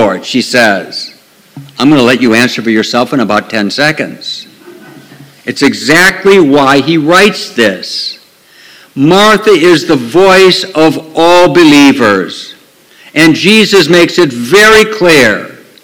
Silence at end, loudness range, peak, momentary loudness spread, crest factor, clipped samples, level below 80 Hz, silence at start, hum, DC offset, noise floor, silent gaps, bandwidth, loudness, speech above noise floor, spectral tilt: 0.3 s; 5 LU; 0 dBFS; 15 LU; 8 dB; 5%; -42 dBFS; 0 s; none; under 0.1%; -40 dBFS; none; 19.5 kHz; -6 LUFS; 34 dB; -4 dB/octave